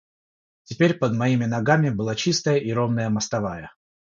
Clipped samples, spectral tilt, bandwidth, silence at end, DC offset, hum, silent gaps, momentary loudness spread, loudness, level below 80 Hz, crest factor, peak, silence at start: under 0.1%; -5.5 dB/octave; 7.6 kHz; 0.3 s; under 0.1%; none; none; 7 LU; -22 LUFS; -56 dBFS; 20 dB; -4 dBFS; 0.7 s